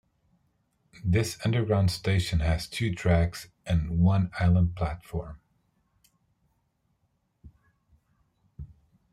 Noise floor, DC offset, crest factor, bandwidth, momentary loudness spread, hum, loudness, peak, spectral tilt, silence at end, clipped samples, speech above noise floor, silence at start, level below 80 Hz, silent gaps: -74 dBFS; under 0.1%; 18 dB; 14 kHz; 17 LU; none; -27 LUFS; -10 dBFS; -6.5 dB/octave; 0.45 s; under 0.1%; 48 dB; 1.05 s; -42 dBFS; none